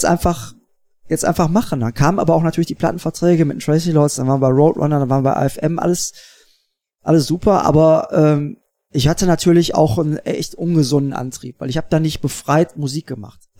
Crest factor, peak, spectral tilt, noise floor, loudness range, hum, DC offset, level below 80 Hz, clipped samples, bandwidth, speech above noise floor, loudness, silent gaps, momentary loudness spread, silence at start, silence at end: 16 dB; -2 dBFS; -6 dB/octave; -65 dBFS; 3 LU; none; under 0.1%; -40 dBFS; under 0.1%; 16.5 kHz; 49 dB; -16 LUFS; none; 11 LU; 0 s; 0.3 s